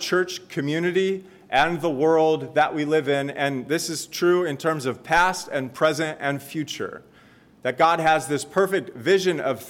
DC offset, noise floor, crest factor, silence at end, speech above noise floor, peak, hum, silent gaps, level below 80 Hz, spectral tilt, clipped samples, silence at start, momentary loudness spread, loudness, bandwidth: under 0.1%; -53 dBFS; 16 dB; 0 s; 30 dB; -6 dBFS; none; none; -58 dBFS; -4.5 dB/octave; under 0.1%; 0 s; 9 LU; -23 LUFS; 17 kHz